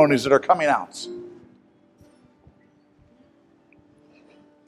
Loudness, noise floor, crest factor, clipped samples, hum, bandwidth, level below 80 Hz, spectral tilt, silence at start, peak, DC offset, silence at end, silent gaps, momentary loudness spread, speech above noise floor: -21 LUFS; -58 dBFS; 22 dB; under 0.1%; none; 13 kHz; -66 dBFS; -5 dB/octave; 0 s; -2 dBFS; under 0.1%; 3.4 s; none; 21 LU; 38 dB